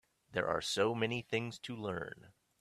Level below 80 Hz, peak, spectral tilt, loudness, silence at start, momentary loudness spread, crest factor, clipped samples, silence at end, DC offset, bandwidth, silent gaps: -70 dBFS; -18 dBFS; -4.5 dB/octave; -37 LUFS; 0.3 s; 10 LU; 20 dB; under 0.1%; 0.3 s; under 0.1%; 14 kHz; none